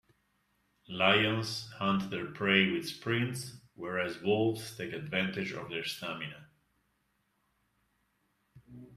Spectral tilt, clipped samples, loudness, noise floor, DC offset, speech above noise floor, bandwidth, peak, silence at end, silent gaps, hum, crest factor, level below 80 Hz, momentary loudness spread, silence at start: -5 dB/octave; under 0.1%; -32 LUFS; -77 dBFS; under 0.1%; 44 dB; 14.5 kHz; -10 dBFS; 0 s; none; none; 26 dB; -70 dBFS; 14 LU; 0.9 s